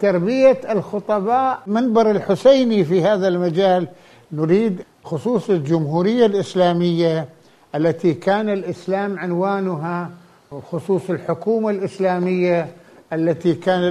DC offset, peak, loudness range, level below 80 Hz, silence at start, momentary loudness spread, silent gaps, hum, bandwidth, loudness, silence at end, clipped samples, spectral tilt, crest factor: under 0.1%; -2 dBFS; 5 LU; -62 dBFS; 0 s; 12 LU; none; none; 11.5 kHz; -19 LUFS; 0 s; under 0.1%; -7.5 dB/octave; 16 dB